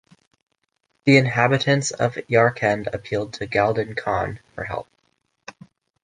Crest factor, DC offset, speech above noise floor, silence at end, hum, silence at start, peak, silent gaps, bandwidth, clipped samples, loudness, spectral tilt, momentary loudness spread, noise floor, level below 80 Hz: 22 dB; under 0.1%; 51 dB; 1.2 s; none; 1.05 s; -2 dBFS; none; 10 kHz; under 0.1%; -21 LUFS; -5.5 dB/octave; 14 LU; -72 dBFS; -52 dBFS